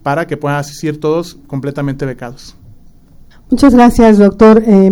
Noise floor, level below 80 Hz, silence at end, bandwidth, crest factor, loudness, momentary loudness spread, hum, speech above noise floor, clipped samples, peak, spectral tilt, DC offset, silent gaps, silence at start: -39 dBFS; -30 dBFS; 0 s; 16.5 kHz; 10 dB; -10 LUFS; 16 LU; none; 29 dB; 1%; 0 dBFS; -7.5 dB/octave; under 0.1%; none; 0.05 s